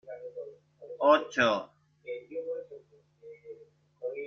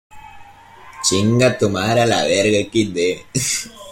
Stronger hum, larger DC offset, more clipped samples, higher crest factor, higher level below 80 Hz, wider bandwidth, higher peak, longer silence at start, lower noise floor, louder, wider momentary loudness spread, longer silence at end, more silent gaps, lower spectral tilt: neither; neither; neither; first, 22 dB vs 16 dB; second, -76 dBFS vs -50 dBFS; second, 7 kHz vs 16.5 kHz; second, -10 dBFS vs -2 dBFS; about the same, 0.05 s vs 0.15 s; first, -57 dBFS vs -42 dBFS; second, -29 LUFS vs -17 LUFS; first, 26 LU vs 5 LU; about the same, 0 s vs 0 s; neither; about the same, -4 dB/octave vs -4 dB/octave